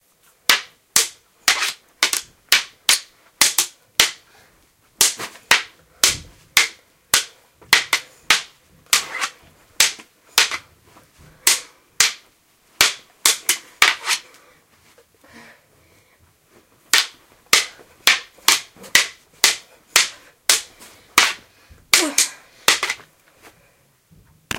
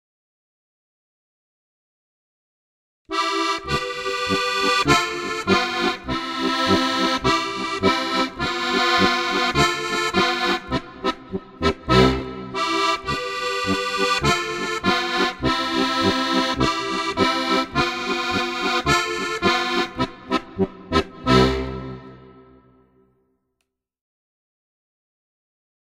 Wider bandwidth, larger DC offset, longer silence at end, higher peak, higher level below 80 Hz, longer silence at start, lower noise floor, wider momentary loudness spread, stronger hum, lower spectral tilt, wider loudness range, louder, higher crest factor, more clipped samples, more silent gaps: about the same, 17 kHz vs 16 kHz; neither; second, 0 s vs 3.6 s; about the same, 0 dBFS vs -2 dBFS; second, -56 dBFS vs -42 dBFS; second, 0.5 s vs 3.1 s; second, -58 dBFS vs -77 dBFS; about the same, 9 LU vs 9 LU; neither; second, 1.5 dB/octave vs -4 dB/octave; about the same, 4 LU vs 5 LU; first, -18 LUFS vs -21 LUFS; about the same, 22 dB vs 22 dB; neither; neither